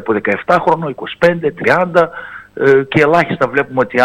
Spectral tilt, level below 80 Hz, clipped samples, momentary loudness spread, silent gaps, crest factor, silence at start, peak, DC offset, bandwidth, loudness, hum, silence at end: -7 dB/octave; -48 dBFS; under 0.1%; 7 LU; none; 14 dB; 0 s; 0 dBFS; under 0.1%; 11.5 kHz; -13 LUFS; none; 0 s